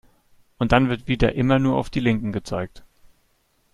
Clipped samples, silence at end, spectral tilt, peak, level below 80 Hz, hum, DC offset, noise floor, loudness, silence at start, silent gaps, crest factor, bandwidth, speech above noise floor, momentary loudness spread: under 0.1%; 0.95 s; -7 dB/octave; 0 dBFS; -38 dBFS; none; under 0.1%; -65 dBFS; -22 LUFS; 0.6 s; none; 22 dB; 11.5 kHz; 44 dB; 10 LU